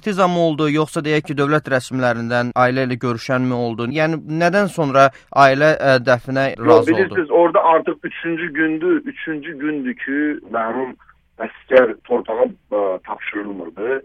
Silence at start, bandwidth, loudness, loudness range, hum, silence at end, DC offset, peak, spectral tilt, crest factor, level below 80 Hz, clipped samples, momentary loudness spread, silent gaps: 0.05 s; 13 kHz; -17 LUFS; 6 LU; none; 0.05 s; under 0.1%; 0 dBFS; -6.5 dB/octave; 18 dB; -56 dBFS; under 0.1%; 12 LU; none